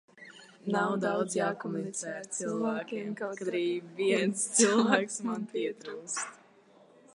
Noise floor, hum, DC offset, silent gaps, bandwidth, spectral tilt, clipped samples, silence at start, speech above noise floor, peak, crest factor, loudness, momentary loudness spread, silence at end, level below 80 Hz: -60 dBFS; none; under 0.1%; none; 11.5 kHz; -3.5 dB/octave; under 0.1%; 0.15 s; 29 dB; -8 dBFS; 24 dB; -31 LUFS; 12 LU; 0.8 s; -84 dBFS